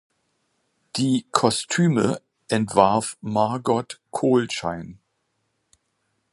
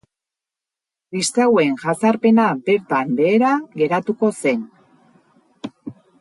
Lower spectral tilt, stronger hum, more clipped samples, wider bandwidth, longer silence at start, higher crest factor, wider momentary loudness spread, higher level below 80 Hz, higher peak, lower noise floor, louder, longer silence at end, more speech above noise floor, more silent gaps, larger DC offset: about the same, -5 dB/octave vs -5 dB/octave; neither; neither; about the same, 11.5 kHz vs 11.5 kHz; second, 0.95 s vs 1.1 s; first, 24 dB vs 16 dB; second, 13 LU vs 20 LU; first, -58 dBFS vs -68 dBFS; first, 0 dBFS vs -4 dBFS; second, -73 dBFS vs -87 dBFS; second, -22 LUFS vs -18 LUFS; first, 1.4 s vs 0.3 s; second, 52 dB vs 70 dB; neither; neither